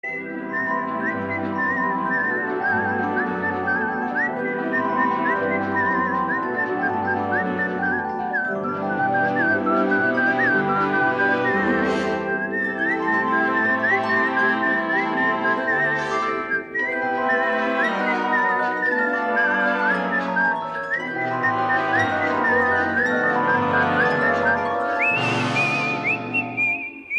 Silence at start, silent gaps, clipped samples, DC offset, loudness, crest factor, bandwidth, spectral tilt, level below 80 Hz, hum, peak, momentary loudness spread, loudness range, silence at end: 0.05 s; none; under 0.1%; under 0.1%; -21 LUFS; 14 dB; 10.5 kHz; -6 dB/octave; -62 dBFS; none; -8 dBFS; 5 LU; 3 LU; 0 s